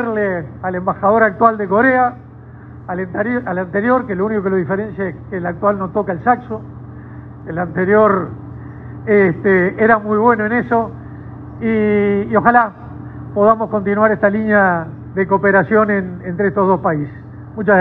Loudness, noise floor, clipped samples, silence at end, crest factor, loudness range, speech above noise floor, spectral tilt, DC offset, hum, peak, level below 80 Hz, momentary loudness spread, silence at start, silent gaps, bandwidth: -15 LUFS; -36 dBFS; under 0.1%; 0 s; 16 dB; 5 LU; 21 dB; -11 dB/octave; under 0.1%; none; 0 dBFS; -46 dBFS; 19 LU; 0 s; none; 4.3 kHz